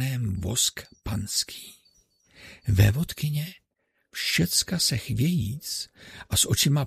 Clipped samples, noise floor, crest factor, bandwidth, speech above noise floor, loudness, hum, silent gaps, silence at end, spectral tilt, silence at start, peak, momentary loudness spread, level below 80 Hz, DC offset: under 0.1%; -75 dBFS; 20 dB; 15.5 kHz; 49 dB; -25 LUFS; none; none; 0 s; -3.5 dB/octave; 0 s; -6 dBFS; 17 LU; -44 dBFS; under 0.1%